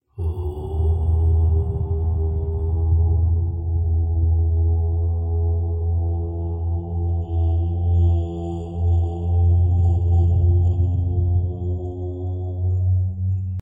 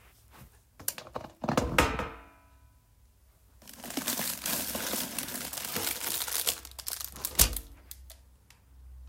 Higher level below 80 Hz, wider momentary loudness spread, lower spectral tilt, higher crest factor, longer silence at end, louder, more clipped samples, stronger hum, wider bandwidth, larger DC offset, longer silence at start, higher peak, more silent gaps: first, -26 dBFS vs -46 dBFS; second, 8 LU vs 19 LU; first, -12 dB/octave vs -2 dB/octave; second, 10 dB vs 32 dB; about the same, 0 s vs 0 s; first, -21 LUFS vs -31 LUFS; neither; neither; second, 1.1 kHz vs 16.5 kHz; neither; about the same, 0.15 s vs 0.05 s; second, -8 dBFS vs -4 dBFS; neither